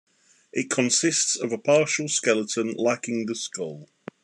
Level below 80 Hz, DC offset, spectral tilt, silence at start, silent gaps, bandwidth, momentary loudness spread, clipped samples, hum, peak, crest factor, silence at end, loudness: -80 dBFS; under 0.1%; -2.5 dB/octave; 0.55 s; none; 12 kHz; 12 LU; under 0.1%; none; -6 dBFS; 18 dB; 0.4 s; -24 LUFS